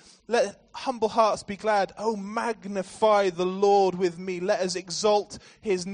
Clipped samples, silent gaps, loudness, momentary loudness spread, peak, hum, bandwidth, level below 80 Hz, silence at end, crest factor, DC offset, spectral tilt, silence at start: under 0.1%; none; -26 LUFS; 10 LU; -8 dBFS; none; 10 kHz; -64 dBFS; 0 s; 18 dB; under 0.1%; -4.5 dB/octave; 0.3 s